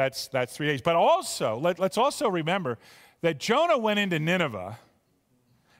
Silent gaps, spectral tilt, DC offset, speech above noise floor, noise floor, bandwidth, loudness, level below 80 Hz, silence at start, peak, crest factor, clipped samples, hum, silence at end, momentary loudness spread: none; -4.5 dB/octave; under 0.1%; 43 dB; -68 dBFS; 16 kHz; -26 LUFS; -68 dBFS; 0 s; -10 dBFS; 16 dB; under 0.1%; none; 1.05 s; 8 LU